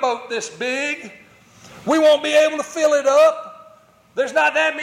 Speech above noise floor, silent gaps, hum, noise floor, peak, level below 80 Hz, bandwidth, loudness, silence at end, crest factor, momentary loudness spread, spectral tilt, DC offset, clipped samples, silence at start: 32 dB; none; none; -50 dBFS; -6 dBFS; -70 dBFS; 14.5 kHz; -17 LUFS; 0 s; 14 dB; 17 LU; -2 dB/octave; under 0.1%; under 0.1%; 0 s